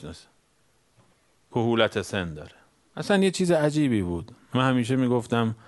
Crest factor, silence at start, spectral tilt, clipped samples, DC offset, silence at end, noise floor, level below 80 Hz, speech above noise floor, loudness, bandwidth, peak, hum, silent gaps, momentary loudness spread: 22 dB; 0 s; -6 dB/octave; under 0.1%; under 0.1%; 0.15 s; -66 dBFS; -56 dBFS; 42 dB; -25 LUFS; 11.5 kHz; -4 dBFS; none; none; 14 LU